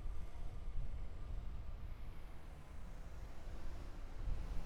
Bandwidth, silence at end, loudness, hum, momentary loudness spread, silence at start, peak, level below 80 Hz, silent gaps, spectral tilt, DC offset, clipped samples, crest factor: 8.2 kHz; 0 s; -52 LUFS; none; 7 LU; 0 s; -28 dBFS; -46 dBFS; none; -6.5 dB/octave; under 0.1%; under 0.1%; 14 dB